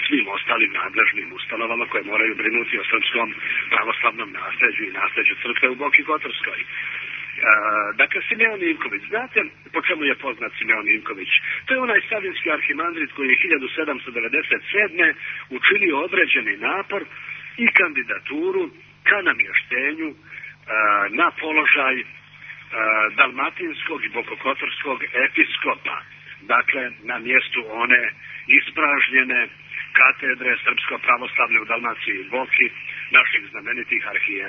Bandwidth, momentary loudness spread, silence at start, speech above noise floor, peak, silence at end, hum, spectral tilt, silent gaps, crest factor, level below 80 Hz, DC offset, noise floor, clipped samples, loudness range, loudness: 6.4 kHz; 11 LU; 0 s; 20 dB; 0 dBFS; 0 s; none; -5 dB/octave; none; 22 dB; -70 dBFS; under 0.1%; -41 dBFS; under 0.1%; 3 LU; -19 LUFS